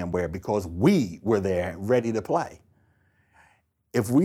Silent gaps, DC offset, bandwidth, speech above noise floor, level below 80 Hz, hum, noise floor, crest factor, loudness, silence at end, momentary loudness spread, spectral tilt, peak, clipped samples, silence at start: none; under 0.1%; 16 kHz; 41 dB; -52 dBFS; none; -65 dBFS; 18 dB; -25 LUFS; 0 s; 7 LU; -7 dB/octave; -8 dBFS; under 0.1%; 0 s